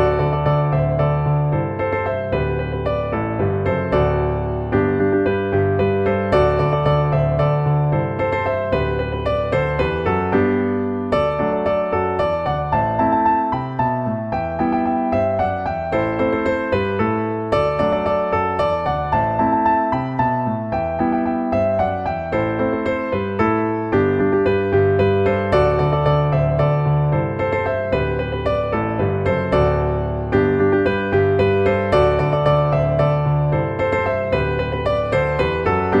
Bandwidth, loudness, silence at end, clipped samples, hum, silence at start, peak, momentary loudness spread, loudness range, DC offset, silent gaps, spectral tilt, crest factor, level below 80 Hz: 7.4 kHz; -19 LUFS; 0 s; under 0.1%; none; 0 s; -2 dBFS; 5 LU; 3 LU; under 0.1%; none; -9 dB/octave; 16 dB; -34 dBFS